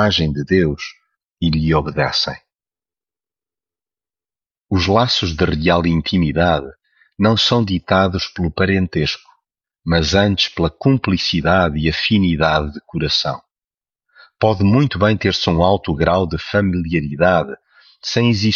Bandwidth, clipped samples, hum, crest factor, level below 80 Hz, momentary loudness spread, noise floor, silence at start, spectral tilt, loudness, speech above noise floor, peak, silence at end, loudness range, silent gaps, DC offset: 7.4 kHz; under 0.1%; none; 16 dB; -36 dBFS; 8 LU; under -90 dBFS; 0 s; -6 dB/octave; -17 LUFS; over 74 dB; -2 dBFS; 0 s; 6 LU; none; under 0.1%